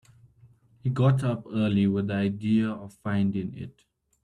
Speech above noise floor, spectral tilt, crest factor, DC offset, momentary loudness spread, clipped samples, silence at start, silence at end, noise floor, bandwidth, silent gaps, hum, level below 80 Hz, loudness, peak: 32 dB; -8.5 dB/octave; 16 dB; under 0.1%; 12 LU; under 0.1%; 0.85 s; 0.55 s; -58 dBFS; 10.5 kHz; none; none; -62 dBFS; -27 LUFS; -10 dBFS